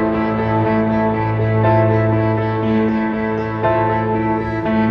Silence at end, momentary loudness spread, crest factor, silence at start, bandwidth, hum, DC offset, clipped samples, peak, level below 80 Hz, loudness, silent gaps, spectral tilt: 0 s; 5 LU; 14 dB; 0 s; 5.4 kHz; none; under 0.1%; under 0.1%; -2 dBFS; -38 dBFS; -17 LUFS; none; -10 dB/octave